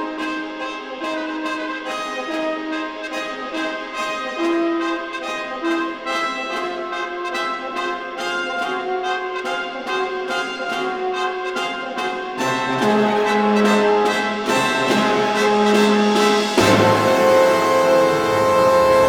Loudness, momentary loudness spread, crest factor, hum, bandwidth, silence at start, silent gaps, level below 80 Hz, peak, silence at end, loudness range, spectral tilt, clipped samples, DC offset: -19 LUFS; 11 LU; 18 dB; none; 19.5 kHz; 0 s; none; -54 dBFS; -2 dBFS; 0 s; 9 LU; -4.5 dB/octave; under 0.1%; under 0.1%